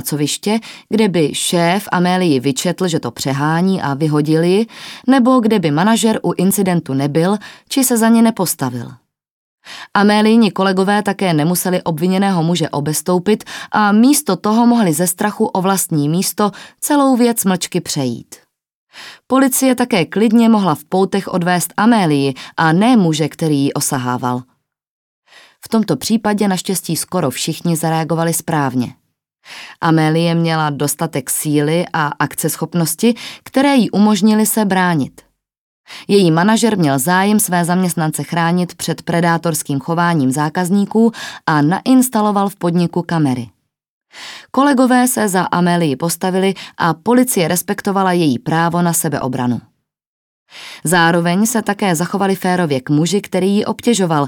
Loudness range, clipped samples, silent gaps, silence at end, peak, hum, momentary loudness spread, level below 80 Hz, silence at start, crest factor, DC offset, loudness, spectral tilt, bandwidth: 3 LU; under 0.1%; 9.30-9.58 s, 18.74-18.87 s, 24.87-25.22 s, 35.58-35.84 s, 43.88-44.01 s, 50.07-50.46 s; 0 s; 0 dBFS; none; 8 LU; -60 dBFS; 0 s; 14 dB; under 0.1%; -15 LUFS; -5 dB/octave; 18.5 kHz